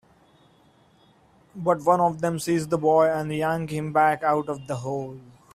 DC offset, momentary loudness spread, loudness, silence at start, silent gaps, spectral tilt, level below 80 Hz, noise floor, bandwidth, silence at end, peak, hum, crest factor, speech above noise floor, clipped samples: under 0.1%; 11 LU; -24 LUFS; 1.55 s; none; -6.5 dB/octave; -60 dBFS; -58 dBFS; 15 kHz; 0.3 s; -6 dBFS; none; 20 dB; 35 dB; under 0.1%